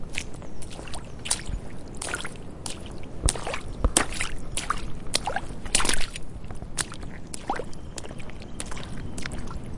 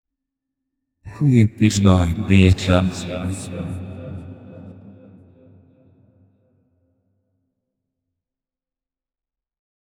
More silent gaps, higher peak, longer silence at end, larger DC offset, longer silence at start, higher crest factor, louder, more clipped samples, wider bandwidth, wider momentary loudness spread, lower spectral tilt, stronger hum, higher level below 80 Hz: neither; about the same, 0 dBFS vs 0 dBFS; second, 0 s vs 5.1 s; neither; second, 0 s vs 1.05 s; first, 28 dB vs 22 dB; second, -31 LUFS vs -18 LUFS; neither; about the same, 11.5 kHz vs 11 kHz; second, 16 LU vs 25 LU; second, -2.5 dB/octave vs -6.5 dB/octave; neither; first, -36 dBFS vs -42 dBFS